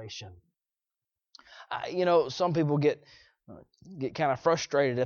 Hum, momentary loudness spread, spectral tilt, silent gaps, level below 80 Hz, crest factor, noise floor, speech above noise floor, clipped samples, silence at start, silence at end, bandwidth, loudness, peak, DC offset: none; 17 LU; -6 dB/octave; none; -68 dBFS; 20 dB; under -90 dBFS; over 61 dB; under 0.1%; 0 s; 0 s; 7.2 kHz; -28 LUFS; -10 dBFS; under 0.1%